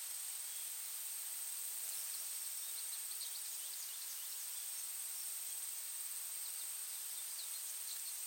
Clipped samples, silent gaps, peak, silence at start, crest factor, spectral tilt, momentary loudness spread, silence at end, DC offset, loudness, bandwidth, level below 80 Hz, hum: under 0.1%; none; -28 dBFS; 0 s; 16 dB; 6 dB/octave; 1 LU; 0 s; under 0.1%; -42 LUFS; 17 kHz; under -90 dBFS; none